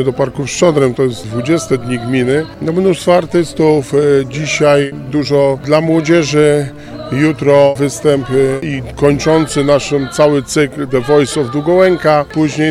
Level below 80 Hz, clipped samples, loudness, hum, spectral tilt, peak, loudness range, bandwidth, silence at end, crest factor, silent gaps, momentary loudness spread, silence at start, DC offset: -40 dBFS; 0.1%; -12 LUFS; none; -5.5 dB/octave; 0 dBFS; 2 LU; 14 kHz; 0 s; 12 dB; none; 6 LU; 0 s; under 0.1%